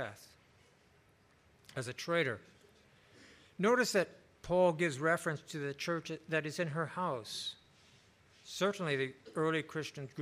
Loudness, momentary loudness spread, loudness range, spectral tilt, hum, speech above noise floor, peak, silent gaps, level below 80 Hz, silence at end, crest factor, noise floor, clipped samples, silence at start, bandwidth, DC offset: -35 LUFS; 14 LU; 6 LU; -4.5 dB/octave; none; 32 dB; -18 dBFS; none; -72 dBFS; 0 s; 20 dB; -67 dBFS; under 0.1%; 0 s; 15.5 kHz; under 0.1%